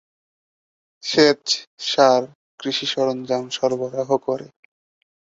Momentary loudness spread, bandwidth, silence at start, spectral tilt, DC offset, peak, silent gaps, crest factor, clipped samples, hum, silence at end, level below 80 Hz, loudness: 12 LU; 8 kHz; 1.05 s; -3.5 dB/octave; under 0.1%; -2 dBFS; 1.67-1.77 s, 2.35-2.58 s; 20 dB; under 0.1%; none; 0.8 s; -66 dBFS; -20 LUFS